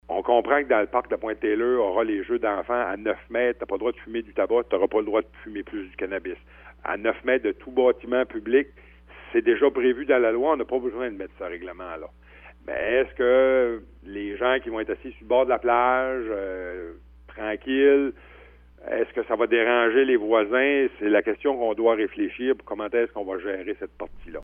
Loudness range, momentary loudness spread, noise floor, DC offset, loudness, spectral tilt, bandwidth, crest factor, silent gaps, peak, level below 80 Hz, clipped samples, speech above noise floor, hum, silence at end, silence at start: 5 LU; 15 LU; -50 dBFS; under 0.1%; -24 LUFS; -8 dB/octave; 3.6 kHz; 20 dB; none; -4 dBFS; -52 dBFS; under 0.1%; 26 dB; 60 Hz at -50 dBFS; 0 s; 0.1 s